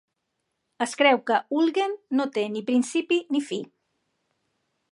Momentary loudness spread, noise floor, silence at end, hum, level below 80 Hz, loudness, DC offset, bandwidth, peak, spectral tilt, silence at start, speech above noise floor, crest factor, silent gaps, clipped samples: 11 LU; -79 dBFS; 1.25 s; none; -84 dBFS; -24 LUFS; under 0.1%; 11.5 kHz; -6 dBFS; -3.5 dB/octave; 0.8 s; 55 dB; 20 dB; none; under 0.1%